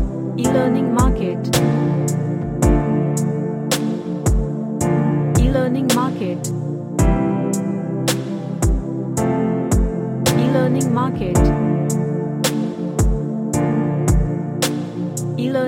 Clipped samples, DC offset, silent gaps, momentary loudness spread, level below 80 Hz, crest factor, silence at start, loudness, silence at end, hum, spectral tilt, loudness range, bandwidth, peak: under 0.1%; under 0.1%; none; 6 LU; -26 dBFS; 16 dB; 0 s; -19 LUFS; 0 s; none; -6 dB/octave; 2 LU; 16.5 kHz; -2 dBFS